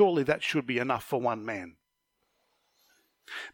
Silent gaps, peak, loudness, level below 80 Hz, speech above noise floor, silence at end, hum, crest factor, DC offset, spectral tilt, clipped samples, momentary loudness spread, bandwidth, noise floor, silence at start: none; -10 dBFS; -30 LUFS; -68 dBFS; 51 dB; 0.05 s; none; 22 dB; under 0.1%; -5.5 dB/octave; under 0.1%; 14 LU; 17.5 kHz; -79 dBFS; 0 s